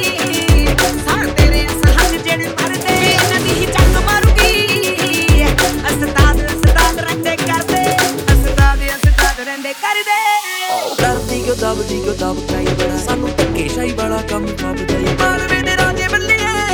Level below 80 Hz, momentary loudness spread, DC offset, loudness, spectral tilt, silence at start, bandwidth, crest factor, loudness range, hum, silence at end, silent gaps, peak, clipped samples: -18 dBFS; 7 LU; under 0.1%; -14 LUFS; -4 dB/octave; 0 s; over 20 kHz; 14 dB; 5 LU; none; 0 s; none; 0 dBFS; under 0.1%